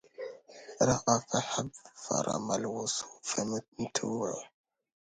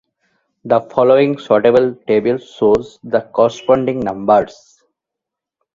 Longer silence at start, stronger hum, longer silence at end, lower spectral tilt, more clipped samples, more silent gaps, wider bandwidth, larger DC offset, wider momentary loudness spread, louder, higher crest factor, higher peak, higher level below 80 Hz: second, 0.2 s vs 0.65 s; neither; second, 0.6 s vs 1.25 s; second, -3.5 dB/octave vs -7 dB/octave; neither; first, 3.68-3.72 s vs none; first, 10.5 kHz vs 7.6 kHz; neither; first, 16 LU vs 8 LU; second, -32 LUFS vs -15 LUFS; first, 24 dB vs 16 dB; second, -10 dBFS vs 0 dBFS; second, -64 dBFS vs -50 dBFS